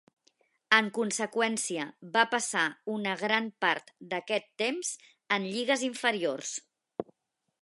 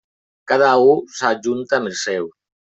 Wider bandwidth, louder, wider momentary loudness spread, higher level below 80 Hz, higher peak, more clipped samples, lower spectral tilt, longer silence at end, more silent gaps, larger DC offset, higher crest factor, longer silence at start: first, 11.5 kHz vs 8.2 kHz; second, -29 LUFS vs -17 LUFS; about the same, 13 LU vs 11 LU; second, -84 dBFS vs -64 dBFS; second, -6 dBFS vs -2 dBFS; neither; second, -2 dB/octave vs -4 dB/octave; about the same, 0.6 s vs 0.5 s; neither; neither; first, 26 dB vs 16 dB; first, 0.7 s vs 0.5 s